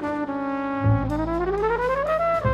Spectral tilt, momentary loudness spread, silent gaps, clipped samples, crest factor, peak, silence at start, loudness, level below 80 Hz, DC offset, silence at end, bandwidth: -8.5 dB/octave; 5 LU; none; under 0.1%; 14 dB; -8 dBFS; 0 s; -24 LUFS; -38 dBFS; under 0.1%; 0 s; 8.4 kHz